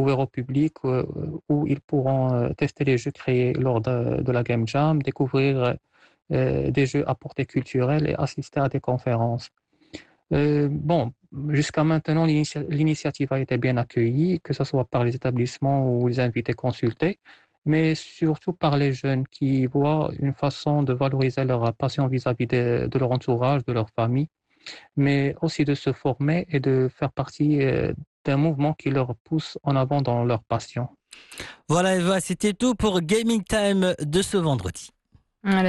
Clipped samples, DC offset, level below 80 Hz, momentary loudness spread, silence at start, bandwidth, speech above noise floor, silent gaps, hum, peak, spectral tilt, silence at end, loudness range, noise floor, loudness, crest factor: under 0.1%; under 0.1%; -50 dBFS; 7 LU; 0 s; 12 kHz; 30 dB; 1.84-1.88 s, 17.58-17.62 s, 28.07-28.25 s, 29.20-29.25 s; none; -10 dBFS; -7 dB/octave; 0 s; 2 LU; -53 dBFS; -24 LUFS; 14 dB